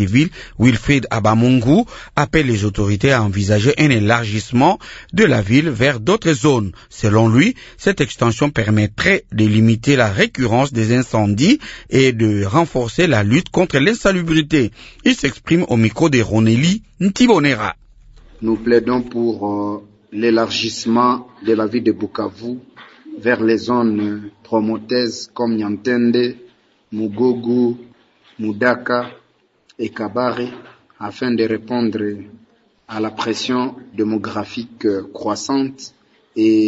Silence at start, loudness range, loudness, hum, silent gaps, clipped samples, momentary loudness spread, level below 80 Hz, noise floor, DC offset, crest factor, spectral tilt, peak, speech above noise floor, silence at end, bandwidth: 0 s; 7 LU; -17 LUFS; none; none; under 0.1%; 11 LU; -42 dBFS; -58 dBFS; under 0.1%; 16 dB; -6 dB/octave; 0 dBFS; 42 dB; 0 s; 8 kHz